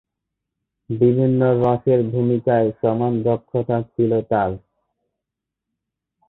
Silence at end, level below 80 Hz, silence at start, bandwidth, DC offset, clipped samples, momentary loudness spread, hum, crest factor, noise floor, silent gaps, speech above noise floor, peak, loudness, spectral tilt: 1.7 s; -52 dBFS; 0.9 s; 4.1 kHz; under 0.1%; under 0.1%; 6 LU; none; 16 dB; -84 dBFS; none; 65 dB; -4 dBFS; -19 LUFS; -12 dB/octave